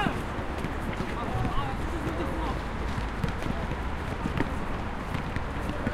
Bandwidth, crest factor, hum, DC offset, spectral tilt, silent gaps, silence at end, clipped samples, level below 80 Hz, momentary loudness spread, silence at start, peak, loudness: 15.5 kHz; 20 dB; none; under 0.1%; -6.5 dB/octave; none; 0 s; under 0.1%; -36 dBFS; 3 LU; 0 s; -10 dBFS; -32 LUFS